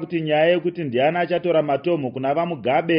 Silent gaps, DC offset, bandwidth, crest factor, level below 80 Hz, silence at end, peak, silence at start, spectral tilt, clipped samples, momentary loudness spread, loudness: none; under 0.1%; 5.4 kHz; 14 dB; -64 dBFS; 0 s; -6 dBFS; 0 s; -4.5 dB/octave; under 0.1%; 5 LU; -21 LUFS